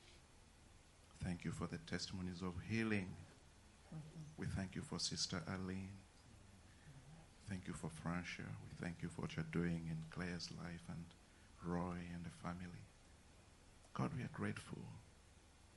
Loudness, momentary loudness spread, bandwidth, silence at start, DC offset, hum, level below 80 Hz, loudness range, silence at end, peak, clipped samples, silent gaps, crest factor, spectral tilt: -47 LUFS; 23 LU; 11.5 kHz; 0 s; under 0.1%; none; -68 dBFS; 4 LU; 0 s; -26 dBFS; under 0.1%; none; 22 dB; -5 dB/octave